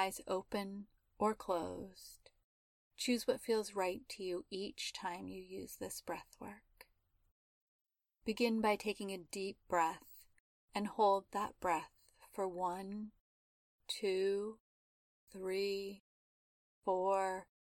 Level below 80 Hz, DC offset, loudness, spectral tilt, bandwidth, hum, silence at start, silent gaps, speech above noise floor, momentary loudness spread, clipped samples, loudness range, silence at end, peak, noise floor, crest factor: -72 dBFS; under 0.1%; -40 LUFS; -4 dB/octave; 17.5 kHz; none; 0 s; 2.44-2.91 s, 7.31-7.85 s, 10.40-10.68 s, 13.20-13.79 s, 14.60-15.27 s, 16.00-16.82 s; 36 dB; 18 LU; under 0.1%; 7 LU; 0.2 s; -20 dBFS; -75 dBFS; 20 dB